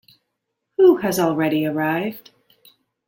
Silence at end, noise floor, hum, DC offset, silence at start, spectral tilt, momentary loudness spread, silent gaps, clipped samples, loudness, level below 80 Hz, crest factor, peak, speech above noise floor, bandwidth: 0.85 s; -77 dBFS; none; under 0.1%; 0.8 s; -6 dB/octave; 15 LU; none; under 0.1%; -19 LUFS; -64 dBFS; 18 dB; -4 dBFS; 56 dB; 17 kHz